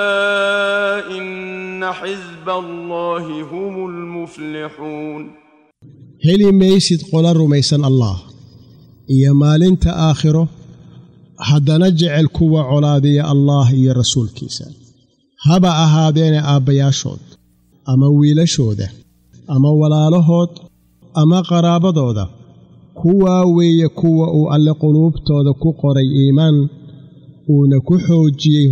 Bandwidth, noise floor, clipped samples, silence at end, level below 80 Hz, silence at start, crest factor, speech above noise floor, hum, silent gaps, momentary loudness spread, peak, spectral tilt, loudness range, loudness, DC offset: 9.8 kHz; -54 dBFS; under 0.1%; 0 s; -38 dBFS; 0 s; 10 dB; 41 dB; none; none; 15 LU; -2 dBFS; -6.5 dB/octave; 9 LU; -14 LUFS; under 0.1%